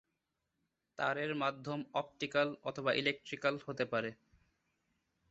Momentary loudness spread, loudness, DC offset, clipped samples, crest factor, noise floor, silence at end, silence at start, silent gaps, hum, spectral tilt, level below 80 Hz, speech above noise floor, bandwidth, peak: 6 LU; -37 LUFS; under 0.1%; under 0.1%; 22 dB; -86 dBFS; 1.2 s; 1 s; none; none; -2.5 dB/octave; -78 dBFS; 49 dB; 8 kHz; -18 dBFS